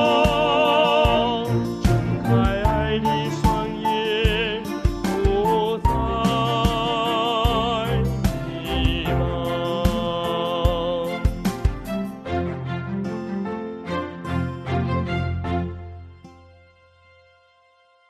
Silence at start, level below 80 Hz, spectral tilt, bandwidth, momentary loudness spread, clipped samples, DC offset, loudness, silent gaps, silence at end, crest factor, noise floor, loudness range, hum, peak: 0 s; -30 dBFS; -6.5 dB/octave; 14 kHz; 10 LU; under 0.1%; under 0.1%; -22 LUFS; none; 1.75 s; 16 dB; -58 dBFS; 7 LU; none; -6 dBFS